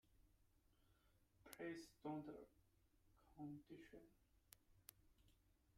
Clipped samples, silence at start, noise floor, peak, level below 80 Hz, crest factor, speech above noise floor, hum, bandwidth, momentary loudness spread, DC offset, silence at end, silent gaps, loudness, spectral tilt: under 0.1%; 0.05 s; -79 dBFS; -30 dBFS; -80 dBFS; 30 dB; 23 dB; none; 15 kHz; 14 LU; under 0.1%; 0.05 s; none; -58 LUFS; -5.5 dB/octave